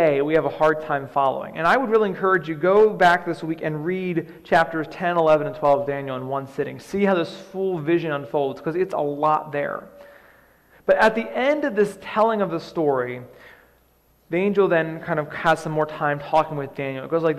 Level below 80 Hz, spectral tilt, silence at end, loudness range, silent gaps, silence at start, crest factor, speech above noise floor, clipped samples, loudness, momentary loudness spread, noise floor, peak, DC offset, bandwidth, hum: -58 dBFS; -6.5 dB/octave; 0 s; 4 LU; none; 0 s; 16 dB; 38 dB; under 0.1%; -22 LUFS; 10 LU; -60 dBFS; -6 dBFS; under 0.1%; 14 kHz; none